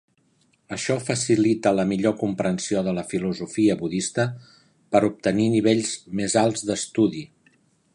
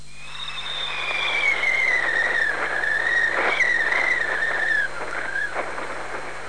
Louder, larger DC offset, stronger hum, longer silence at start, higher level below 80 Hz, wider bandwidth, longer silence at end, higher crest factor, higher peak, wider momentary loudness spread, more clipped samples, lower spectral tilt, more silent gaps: about the same, -23 LUFS vs -21 LUFS; second, under 0.1% vs 2%; second, none vs 50 Hz at -50 dBFS; first, 0.7 s vs 0 s; second, -58 dBFS vs -52 dBFS; about the same, 11.5 kHz vs 10.5 kHz; first, 0.7 s vs 0 s; about the same, 18 dB vs 14 dB; first, -4 dBFS vs -8 dBFS; second, 7 LU vs 12 LU; neither; first, -5 dB/octave vs -1.5 dB/octave; neither